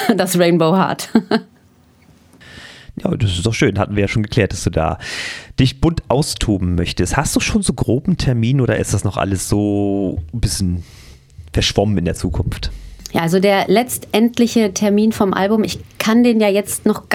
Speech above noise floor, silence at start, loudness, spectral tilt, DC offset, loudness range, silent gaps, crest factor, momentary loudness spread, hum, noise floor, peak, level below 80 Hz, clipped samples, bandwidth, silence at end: 34 dB; 0 s; -17 LUFS; -5.5 dB/octave; under 0.1%; 5 LU; none; 16 dB; 9 LU; none; -50 dBFS; 0 dBFS; -32 dBFS; under 0.1%; 17.5 kHz; 0 s